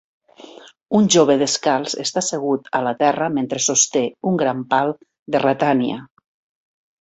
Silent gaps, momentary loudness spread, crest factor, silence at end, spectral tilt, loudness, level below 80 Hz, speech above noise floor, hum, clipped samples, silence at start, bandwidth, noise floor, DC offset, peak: 5.19-5.26 s; 8 LU; 18 dB; 0.95 s; -3.5 dB/octave; -18 LUFS; -62 dBFS; 25 dB; none; under 0.1%; 0.4 s; 8.4 kHz; -43 dBFS; under 0.1%; -2 dBFS